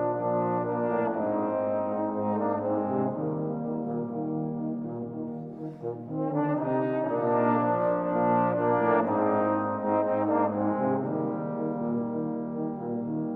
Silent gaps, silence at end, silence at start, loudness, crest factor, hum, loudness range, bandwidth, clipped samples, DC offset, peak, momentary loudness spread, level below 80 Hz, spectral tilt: none; 0 s; 0 s; -28 LUFS; 16 dB; none; 6 LU; 4 kHz; under 0.1%; under 0.1%; -12 dBFS; 8 LU; -70 dBFS; -11.5 dB/octave